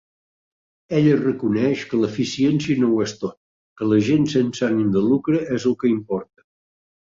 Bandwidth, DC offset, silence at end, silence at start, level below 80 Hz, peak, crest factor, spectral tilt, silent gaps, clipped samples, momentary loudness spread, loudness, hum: 7.6 kHz; under 0.1%; 0.8 s; 0.9 s; -58 dBFS; -6 dBFS; 16 dB; -7 dB/octave; 3.37-3.76 s; under 0.1%; 8 LU; -20 LUFS; none